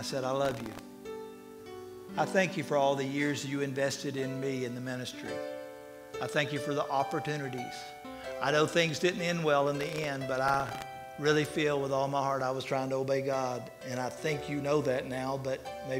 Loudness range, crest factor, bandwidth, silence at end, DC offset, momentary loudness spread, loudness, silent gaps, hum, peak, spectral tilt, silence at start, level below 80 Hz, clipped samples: 5 LU; 20 dB; 16 kHz; 0 s; under 0.1%; 15 LU; -32 LUFS; none; none; -12 dBFS; -5 dB/octave; 0 s; -64 dBFS; under 0.1%